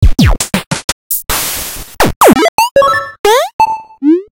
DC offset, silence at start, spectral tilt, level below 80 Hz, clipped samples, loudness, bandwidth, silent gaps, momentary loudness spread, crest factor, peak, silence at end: under 0.1%; 0 s; -4.5 dB/octave; -20 dBFS; 0.3%; -11 LUFS; over 20 kHz; 0.67-0.71 s, 0.84-1.10 s, 2.16-2.21 s, 2.49-2.58 s, 2.71-2.75 s, 3.19-3.24 s, 3.53-3.59 s; 9 LU; 10 dB; 0 dBFS; 0.1 s